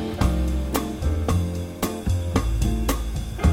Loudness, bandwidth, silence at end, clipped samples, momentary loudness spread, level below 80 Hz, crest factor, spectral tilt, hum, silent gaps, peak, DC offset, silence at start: -25 LUFS; 17 kHz; 0 s; under 0.1%; 5 LU; -26 dBFS; 16 dB; -6 dB/octave; none; none; -6 dBFS; under 0.1%; 0 s